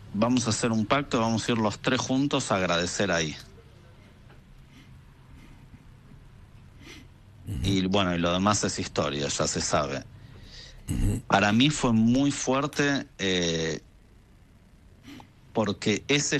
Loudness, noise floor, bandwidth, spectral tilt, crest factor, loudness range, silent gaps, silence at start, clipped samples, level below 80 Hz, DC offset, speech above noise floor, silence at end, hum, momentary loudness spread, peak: -26 LUFS; -55 dBFS; 13 kHz; -4.5 dB/octave; 20 dB; 7 LU; none; 0 s; under 0.1%; -44 dBFS; under 0.1%; 29 dB; 0 s; none; 19 LU; -8 dBFS